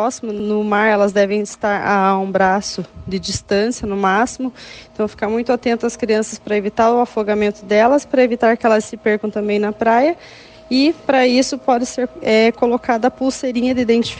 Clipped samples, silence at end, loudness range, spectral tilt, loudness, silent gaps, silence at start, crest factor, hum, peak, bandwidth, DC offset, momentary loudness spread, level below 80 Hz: under 0.1%; 0 s; 3 LU; -4.5 dB/octave; -17 LUFS; none; 0 s; 14 dB; none; -2 dBFS; 9.8 kHz; under 0.1%; 8 LU; -48 dBFS